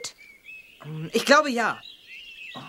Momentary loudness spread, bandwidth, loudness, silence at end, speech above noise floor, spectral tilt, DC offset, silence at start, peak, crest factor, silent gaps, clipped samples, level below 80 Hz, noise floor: 24 LU; 16.5 kHz; -22 LUFS; 0 s; 24 dB; -3.5 dB/octave; under 0.1%; 0 s; -2 dBFS; 24 dB; none; under 0.1%; -70 dBFS; -47 dBFS